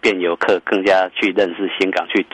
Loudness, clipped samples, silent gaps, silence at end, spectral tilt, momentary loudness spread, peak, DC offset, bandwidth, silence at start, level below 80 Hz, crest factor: -17 LUFS; under 0.1%; none; 0.1 s; -4.5 dB/octave; 4 LU; -4 dBFS; under 0.1%; 10.5 kHz; 0.05 s; -58 dBFS; 14 dB